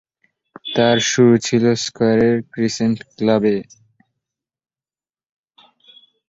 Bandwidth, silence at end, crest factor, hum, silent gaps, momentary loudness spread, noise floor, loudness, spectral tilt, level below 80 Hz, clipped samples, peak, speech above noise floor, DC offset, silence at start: 7.8 kHz; 2.7 s; 18 dB; none; none; 9 LU; under -90 dBFS; -17 LUFS; -5 dB/octave; -56 dBFS; under 0.1%; -2 dBFS; over 74 dB; under 0.1%; 0.65 s